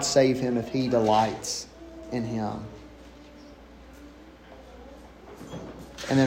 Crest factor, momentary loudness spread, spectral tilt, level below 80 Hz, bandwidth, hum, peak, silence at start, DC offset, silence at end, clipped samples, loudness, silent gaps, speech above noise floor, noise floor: 20 dB; 26 LU; -5 dB/octave; -52 dBFS; 16 kHz; none; -8 dBFS; 0 s; under 0.1%; 0 s; under 0.1%; -26 LUFS; none; 23 dB; -48 dBFS